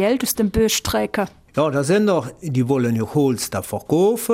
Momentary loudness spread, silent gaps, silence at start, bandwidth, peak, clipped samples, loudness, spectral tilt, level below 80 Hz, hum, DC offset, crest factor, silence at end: 7 LU; none; 0 s; 16 kHz; -6 dBFS; under 0.1%; -20 LUFS; -5 dB/octave; -42 dBFS; none; under 0.1%; 14 dB; 0 s